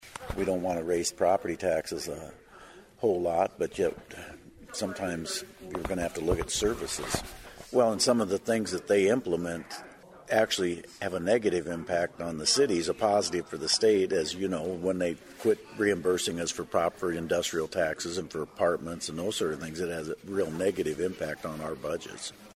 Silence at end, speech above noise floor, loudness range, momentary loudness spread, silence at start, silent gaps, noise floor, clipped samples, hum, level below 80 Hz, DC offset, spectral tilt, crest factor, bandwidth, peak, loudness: 0.05 s; 22 dB; 5 LU; 11 LU; 0 s; none; -52 dBFS; under 0.1%; none; -52 dBFS; under 0.1%; -3.5 dB/octave; 20 dB; 16 kHz; -10 dBFS; -29 LUFS